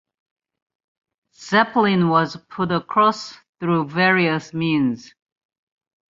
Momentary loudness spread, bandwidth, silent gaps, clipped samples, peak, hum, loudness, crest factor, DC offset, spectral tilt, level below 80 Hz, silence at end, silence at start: 11 LU; 7.6 kHz; 3.49-3.53 s; under 0.1%; -2 dBFS; none; -19 LUFS; 20 dB; under 0.1%; -6 dB/octave; -62 dBFS; 1.1 s; 1.4 s